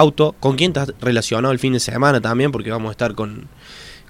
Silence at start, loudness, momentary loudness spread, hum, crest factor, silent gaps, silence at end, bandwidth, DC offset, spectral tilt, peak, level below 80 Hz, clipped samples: 0 s; -18 LUFS; 16 LU; none; 18 dB; none; 0.15 s; 16 kHz; under 0.1%; -5.5 dB/octave; 0 dBFS; -46 dBFS; under 0.1%